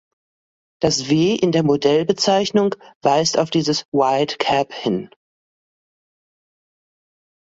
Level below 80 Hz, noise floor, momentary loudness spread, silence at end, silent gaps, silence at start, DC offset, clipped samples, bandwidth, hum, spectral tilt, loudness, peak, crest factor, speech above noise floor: -56 dBFS; under -90 dBFS; 6 LU; 2.4 s; 2.95-3.01 s, 3.85-3.92 s; 0.8 s; under 0.1%; under 0.1%; 8 kHz; none; -4.5 dB/octave; -18 LUFS; -2 dBFS; 18 dB; over 72 dB